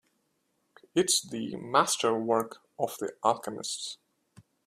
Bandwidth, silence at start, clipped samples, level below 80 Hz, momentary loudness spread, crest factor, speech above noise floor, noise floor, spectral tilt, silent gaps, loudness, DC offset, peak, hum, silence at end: 15.5 kHz; 0.95 s; under 0.1%; -74 dBFS; 11 LU; 24 dB; 46 dB; -75 dBFS; -2.5 dB/octave; none; -29 LUFS; under 0.1%; -6 dBFS; none; 0.25 s